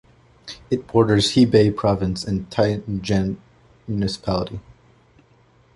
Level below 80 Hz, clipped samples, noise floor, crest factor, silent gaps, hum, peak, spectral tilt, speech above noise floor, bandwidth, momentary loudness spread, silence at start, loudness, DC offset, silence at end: -44 dBFS; under 0.1%; -56 dBFS; 20 dB; none; none; -2 dBFS; -6 dB/octave; 36 dB; 11.5 kHz; 21 LU; 0.45 s; -20 LUFS; under 0.1%; 1.15 s